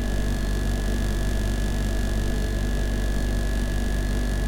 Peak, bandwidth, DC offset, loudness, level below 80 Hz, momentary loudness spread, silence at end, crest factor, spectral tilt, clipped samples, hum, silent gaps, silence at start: -14 dBFS; 16.5 kHz; under 0.1%; -27 LUFS; -24 dBFS; 0 LU; 0 s; 10 dB; -5.5 dB/octave; under 0.1%; 50 Hz at -45 dBFS; none; 0 s